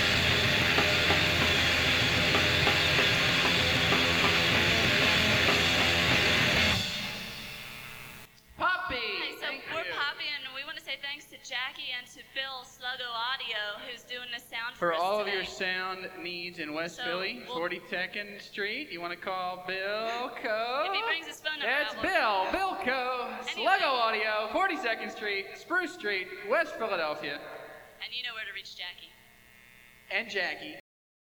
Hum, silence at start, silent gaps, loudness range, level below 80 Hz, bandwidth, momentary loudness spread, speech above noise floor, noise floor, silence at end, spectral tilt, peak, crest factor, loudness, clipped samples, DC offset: none; 0 s; none; 11 LU; -52 dBFS; over 20 kHz; 15 LU; 25 dB; -57 dBFS; 0.6 s; -3 dB/octave; -10 dBFS; 20 dB; -28 LUFS; under 0.1%; under 0.1%